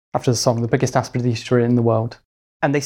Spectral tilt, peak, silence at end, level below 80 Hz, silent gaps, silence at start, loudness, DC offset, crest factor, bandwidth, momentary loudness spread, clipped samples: -6 dB/octave; -2 dBFS; 0 s; -52 dBFS; 2.25-2.60 s; 0.15 s; -19 LUFS; under 0.1%; 18 dB; 15 kHz; 5 LU; under 0.1%